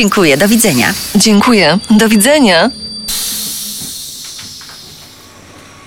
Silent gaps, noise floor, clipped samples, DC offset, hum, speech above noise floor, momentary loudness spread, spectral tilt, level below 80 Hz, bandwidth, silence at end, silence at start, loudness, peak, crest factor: none; -36 dBFS; under 0.1%; under 0.1%; none; 28 dB; 18 LU; -3.5 dB/octave; -42 dBFS; 19.5 kHz; 0.8 s; 0 s; -10 LUFS; 0 dBFS; 12 dB